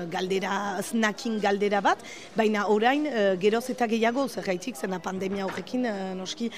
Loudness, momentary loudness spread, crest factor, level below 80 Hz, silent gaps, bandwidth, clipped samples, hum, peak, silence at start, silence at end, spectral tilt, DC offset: -27 LUFS; 8 LU; 16 dB; -68 dBFS; none; 15.5 kHz; under 0.1%; none; -10 dBFS; 0 s; 0 s; -4.5 dB/octave; 0.2%